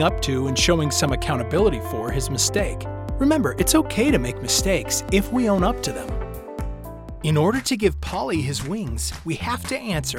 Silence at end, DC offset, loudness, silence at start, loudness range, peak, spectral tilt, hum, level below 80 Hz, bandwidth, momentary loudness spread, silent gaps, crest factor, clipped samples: 0 s; under 0.1%; -22 LUFS; 0 s; 4 LU; -6 dBFS; -4.5 dB/octave; none; -34 dBFS; 18 kHz; 12 LU; none; 16 dB; under 0.1%